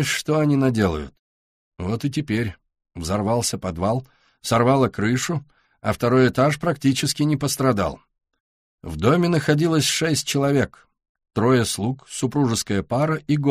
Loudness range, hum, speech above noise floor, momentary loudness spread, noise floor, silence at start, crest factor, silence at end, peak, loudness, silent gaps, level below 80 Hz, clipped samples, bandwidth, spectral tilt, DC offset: 4 LU; none; over 69 dB; 10 LU; under -90 dBFS; 0 s; 18 dB; 0 s; -4 dBFS; -21 LUFS; 1.19-1.72 s, 8.40-8.78 s, 11.09-11.15 s; -46 dBFS; under 0.1%; 15.5 kHz; -5 dB/octave; under 0.1%